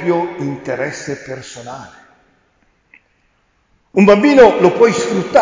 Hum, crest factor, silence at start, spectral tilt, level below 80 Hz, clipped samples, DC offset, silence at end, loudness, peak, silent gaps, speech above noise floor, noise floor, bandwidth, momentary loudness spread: none; 14 dB; 0 s; -6 dB/octave; -50 dBFS; under 0.1%; under 0.1%; 0 s; -12 LUFS; 0 dBFS; none; 47 dB; -59 dBFS; 7.6 kHz; 22 LU